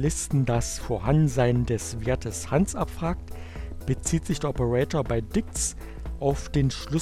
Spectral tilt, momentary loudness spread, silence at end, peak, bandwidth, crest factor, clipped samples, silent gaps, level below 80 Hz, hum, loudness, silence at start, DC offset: -5.5 dB/octave; 10 LU; 0 s; -8 dBFS; 14 kHz; 18 dB; under 0.1%; none; -36 dBFS; none; -26 LUFS; 0 s; under 0.1%